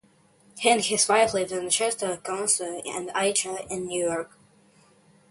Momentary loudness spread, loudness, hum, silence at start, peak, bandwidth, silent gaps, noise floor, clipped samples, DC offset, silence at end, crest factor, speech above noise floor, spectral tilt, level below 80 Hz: 11 LU; -25 LUFS; none; 0.55 s; -6 dBFS; 12 kHz; none; -60 dBFS; under 0.1%; under 0.1%; 1.05 s; 22 dB; 34 dB; -1.5 dB/octave; -64 dBFS